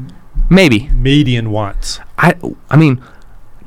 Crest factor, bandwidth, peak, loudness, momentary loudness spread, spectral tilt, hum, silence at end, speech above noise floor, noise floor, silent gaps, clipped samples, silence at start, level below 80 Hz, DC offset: 12 dB; 15.5 kHz; 0 dBFS; -12 LUFS; 14 LU; -6.5 dB/octave; none; 0 s; 21 dB; -32 dBFS; none; 0.6%; 0 s; -20 dBFS; under 0.1%